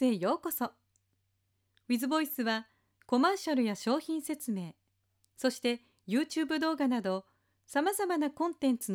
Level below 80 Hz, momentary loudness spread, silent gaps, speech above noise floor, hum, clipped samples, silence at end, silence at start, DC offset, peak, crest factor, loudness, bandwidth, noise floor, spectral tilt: -80 dBFS; 7 LU; none; 46 dB; none; under 0.1%; 0 s; 0 s; under 0.1%; -16 dBFS; 16 dB; -32 LUFS; 17.5 kHz; -78 dBFS; -4 dB/octave